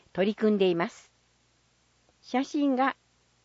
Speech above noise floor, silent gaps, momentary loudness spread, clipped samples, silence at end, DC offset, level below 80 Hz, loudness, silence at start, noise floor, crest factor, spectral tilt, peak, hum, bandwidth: 41 dB; none; 8 LU; under 0.1%; 0.5 s; under 0.1%; -72 dBFS; -27 LUFS; 0.15 s; -68 dBFS; 18 dB; -6 dB/octave; -12 dBFS; 60 Hz at -60 dBFS; 8 kHz